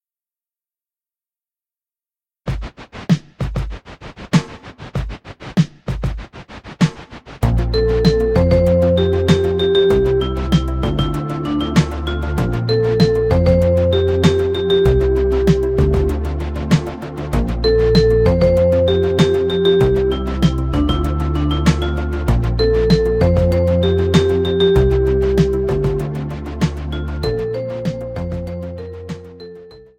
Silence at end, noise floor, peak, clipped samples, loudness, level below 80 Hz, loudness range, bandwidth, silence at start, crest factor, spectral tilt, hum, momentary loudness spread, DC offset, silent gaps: 0.2 s; under -90 dBFS; 0 dBFS; under 0.1%; -17 LUFS; -24 dBFS; 9 LU; 15.5 kHz; 2.45 s; 16 dB; -7.5 dB/octave; none; 14 LU; under 0.1%; none